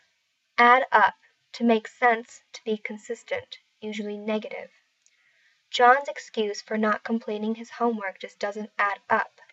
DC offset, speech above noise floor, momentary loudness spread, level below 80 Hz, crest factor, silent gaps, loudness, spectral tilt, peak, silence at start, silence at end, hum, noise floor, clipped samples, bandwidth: under 0.1%; 47 dB; 17 LU; -84 dBFS; 22 dB; none; -25 LUFS; -4 dB/octave; -4 dBFS; 0.6 s; 0.25 s; none; -72 dBFS; under 0.1%; 8 kHz